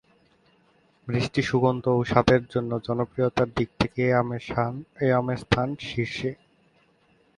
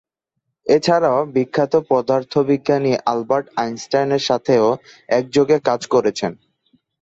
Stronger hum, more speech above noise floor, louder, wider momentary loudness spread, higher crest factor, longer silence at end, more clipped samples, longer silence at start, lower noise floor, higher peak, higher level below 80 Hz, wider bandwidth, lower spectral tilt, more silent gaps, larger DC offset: neither; second, 39 dB vs 59 dB; second, -25 LUFS vs -18 LUFS; about the same, 8 LU vs 6 LU; first, 24 dB vs 16 dB; first, 1.05 s vs 0.65 s; neither; first, 1.05 s vs 0.65 s; second, -63 dBFS vs -76 dBFS; about the same, -2 dBFS vs -2 dBFS; first, -48 dBFS vs -60 dBFS; first, 10.5 kHz vs 8 kHz; first, -7 dB/octave vs -5.5 dB/octave; neither; neither